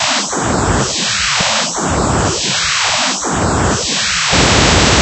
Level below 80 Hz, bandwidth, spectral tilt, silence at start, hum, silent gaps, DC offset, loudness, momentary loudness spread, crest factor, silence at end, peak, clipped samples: -26 dBFS; 11 kHz; -2.5 dB/octave; 0 s; none; none; under 0.1%; -12 LUFS; 6 LU; 14 dB; 0 s; 0 dBFS; under 0.1%